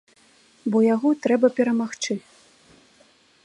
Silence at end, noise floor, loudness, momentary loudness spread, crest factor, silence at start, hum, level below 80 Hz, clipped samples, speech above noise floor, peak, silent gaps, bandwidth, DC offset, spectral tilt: 1.25 s; -57 dBFS; -22 LUFS; 10 LU; 18 dB; 0.65 s; none; -74 dBFS; under 0.1%; 37 dB; -6 dBFS; none; 10.5 kHz; under 0.1%; -5 dB/octave